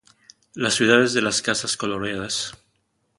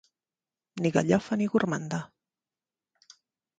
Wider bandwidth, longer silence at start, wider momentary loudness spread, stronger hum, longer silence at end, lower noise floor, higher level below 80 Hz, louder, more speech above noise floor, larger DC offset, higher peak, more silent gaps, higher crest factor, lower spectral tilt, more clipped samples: first, 11.5 kHz vs 9.2 kHz; second, 0.55 s vs 0.75 s; second, 10 LU vs 15 LU; neither; second, 0.65 s vs 1.55 s; second, -70 dBFS vs under -90 dBFS; first, -58 dBFS vs -66 dBFS; first, -21 LUFS vs -28 LUFS; second, 48 dB vs over 63 dB; neither; first, 0 dBFS vs -8 dBFS; neither; about the same, 24 dB vs 24 dB; second, -2.5 dB/octave vs -6.5 dB/octave; neither